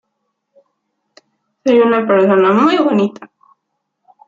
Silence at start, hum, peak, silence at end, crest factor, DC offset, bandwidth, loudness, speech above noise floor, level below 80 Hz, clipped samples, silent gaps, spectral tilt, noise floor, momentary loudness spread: 1.65 s; none; -2 dBFS; 1.05 s; 14 dB; under 0.1%; 7.6 kHz; -12 LUFS; 61 dB; -64 dBFS; under 0.1%; none; -7 dB/octave; -73 dBFS; 7 LU